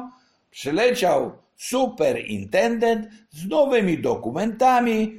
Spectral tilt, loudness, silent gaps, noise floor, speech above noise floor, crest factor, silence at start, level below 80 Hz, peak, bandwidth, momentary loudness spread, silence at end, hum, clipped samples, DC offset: -5 dB/octave; -21 LUFS; none; -46 dBFS; 25 dB; 16 dB; 0 s; -56 dBFS; -6 dBFS; 16 kHz; 14 LU; 0 s; none; under 0.1%; under 0.1%